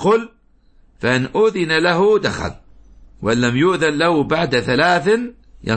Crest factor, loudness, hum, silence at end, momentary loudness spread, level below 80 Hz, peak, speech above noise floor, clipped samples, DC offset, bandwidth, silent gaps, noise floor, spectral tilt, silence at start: 16 dB; -17 LUFS; none; 0 s; 11 LU; -44 dBFS; -2 dBFS; 35 dB; under 0.1%; under 0.1%; 8.8 kHz; none; -51 dBFS; -5.5 dB/octave; 0 s